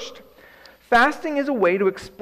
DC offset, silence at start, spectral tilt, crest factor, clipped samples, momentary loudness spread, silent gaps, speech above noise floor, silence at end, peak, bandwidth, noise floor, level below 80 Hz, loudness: under 0.1%; 0 s; -5 dB/octave; 14 dB; under 0.1%; 7 LU; none; 29 dB; 0.15 s; -8 dBFS; 15 kHz; -49 dBFS; -54 dBFS; -20 LUFS